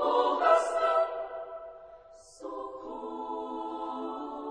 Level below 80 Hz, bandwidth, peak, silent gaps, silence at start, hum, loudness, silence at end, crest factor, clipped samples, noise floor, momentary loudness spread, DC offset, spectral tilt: -68 dBFS; 10 kHz; -10 dBFS; none; 0 s; none; -30 LUFS; 0 s; 22 dB; under 0.1%; -53 dBFS; 20 LU; under 0.1%; -2.5 dB/octave